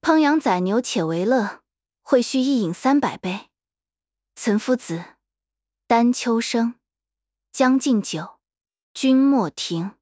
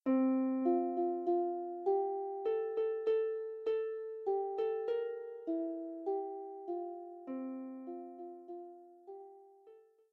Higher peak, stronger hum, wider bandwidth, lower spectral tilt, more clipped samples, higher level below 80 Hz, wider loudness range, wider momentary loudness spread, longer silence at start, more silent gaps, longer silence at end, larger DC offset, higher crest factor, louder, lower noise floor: first, -4 dBFS vs -22 dBFS; neither; first, 8 kHz vs 4.5 kHz; about the same, -5 dB/octave vs -4.5 dB/octave; neither; first, -68 dBFS vs under -90 dBFS; second, 3 LU vs 11 LU; second, 12 LU vs 16 LU; about the same, 0.05 s vs 0.05 s; first, 8.82-8.95 s vs none; second, 0.1 s vs 0.3 s; neither; about the same, 18 dB vs 16 dB; first, -21 LUFS vs -37 LUFS; first, under -90 dBFS vs -62 dBFS